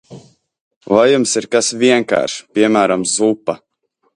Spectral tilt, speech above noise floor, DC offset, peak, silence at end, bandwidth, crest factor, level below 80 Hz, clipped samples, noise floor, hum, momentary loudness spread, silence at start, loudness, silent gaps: -3.5 dB/octave; 51 dB; under 0.1%; 0 dBFS; 0.6 s; 11.5 kHz; 16 dB; -58 dBFS; under 0.1%; -65 dBFS; none; 8 LU; 0.1 s; -14 LUFS; 0.61-0.81 s